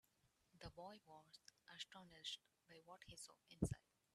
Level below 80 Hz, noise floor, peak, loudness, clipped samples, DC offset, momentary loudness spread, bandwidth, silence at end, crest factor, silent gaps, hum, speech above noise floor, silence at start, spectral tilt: -70 dBFS; -82 dBFS; -28 dBFS; -55 LUFS; under 0.1%; under 0.1%; 17 LU; 13 kHz; 0.35 s; 28 dB; none; none; 28 dB; 0.55 s; -4.5 dB/octave